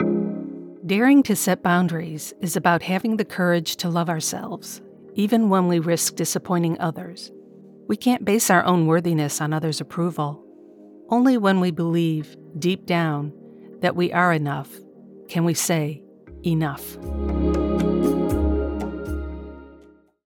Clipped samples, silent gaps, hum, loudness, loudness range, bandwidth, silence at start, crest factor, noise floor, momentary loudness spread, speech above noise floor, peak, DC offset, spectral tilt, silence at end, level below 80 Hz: under 0.1%; none; none; -22 LUFS; 3 LU; 19 kHz; 0 s; 18 dB; -52 dBFS; 15 LU; 30 dB; -4 dBFS; under 0.1%; -5 dB/octave; 0.5 s; -38 dBFS